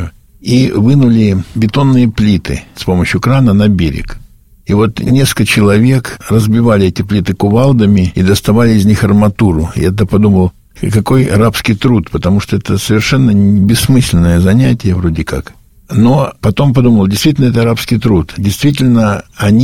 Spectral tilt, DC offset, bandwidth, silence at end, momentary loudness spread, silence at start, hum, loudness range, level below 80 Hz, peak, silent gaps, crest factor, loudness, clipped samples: -6.5 dB/octave; under 0.1%; 17 kHz; 0 s; 6 LU; 0 s; none; 2 LU; -28 dBFS; 0 dBFS; none; 10 dB; -10 LUFS; 0.1%